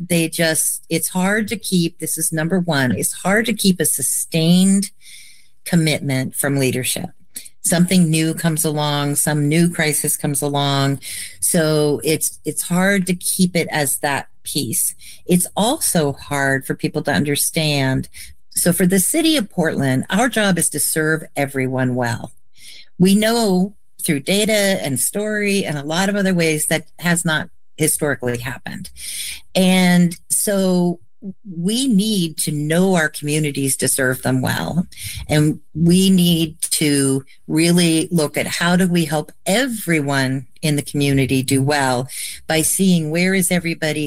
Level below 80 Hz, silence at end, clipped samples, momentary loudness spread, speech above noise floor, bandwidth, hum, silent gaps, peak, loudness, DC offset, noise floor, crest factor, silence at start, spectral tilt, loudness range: -50 dBFS; 0 s; under 0.1%; 8 LU; 26 dB; 16 kHz; none; none; -2 dBFS; -18 LUFS; 1%; -43 dBFS; 16 dB; 0 s; -4 dB/octave; 2 LU